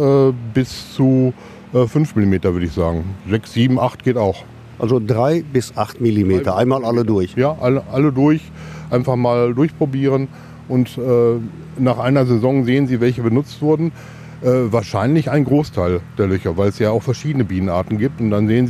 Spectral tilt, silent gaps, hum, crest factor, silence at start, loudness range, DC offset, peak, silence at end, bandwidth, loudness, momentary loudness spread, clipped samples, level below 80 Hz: -8 dB/octave; none; none; 14 dB; 0 s; 1 LU; under 0.1%; -2 dBFS; 0 s; 14 kHz; -17 LUFS; 6 LU; under 0.1%; -44 dBFS